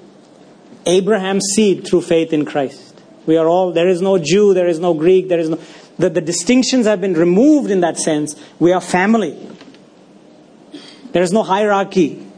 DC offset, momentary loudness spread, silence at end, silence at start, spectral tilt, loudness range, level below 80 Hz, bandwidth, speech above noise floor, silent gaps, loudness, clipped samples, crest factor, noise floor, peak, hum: under 0.1%; 9 LU; 0.05 s; 0.85 s; -5 dB/octave; 4 LU; -58 dBFS; 11 kHz; 30 dB; none; -15 LUFS; under 0.1%; 14 dB; -44 dBFS; 0 dBFS; none